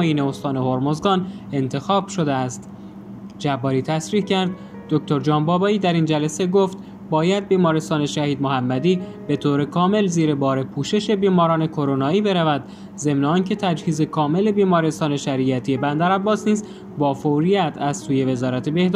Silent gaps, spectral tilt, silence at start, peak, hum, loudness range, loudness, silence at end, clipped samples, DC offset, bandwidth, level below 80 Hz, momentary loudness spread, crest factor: none; -6.5 dB/octave; 0 s; -4 dBFS; none; 4 LU; -20 LUFS; 0 s; under 0.1%; under 0.1%; 11.5 kHz; -58 dBFS; 7 LU; 16 dB